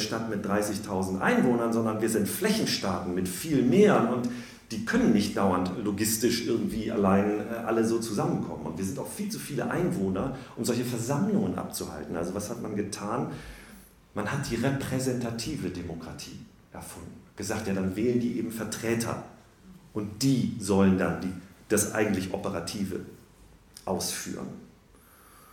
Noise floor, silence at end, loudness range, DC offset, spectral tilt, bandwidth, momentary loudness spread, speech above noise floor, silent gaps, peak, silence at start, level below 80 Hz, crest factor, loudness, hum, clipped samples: -56 dBFS; 0.05 s; 7 LU; under 0.1%; -5 dB/octave; 17.5 kHz; 15 LU; 28 dB; none; -8 dBFS; 0 s; -56 dBFS; 20 dB; -28 LUFS; none; under 0.1%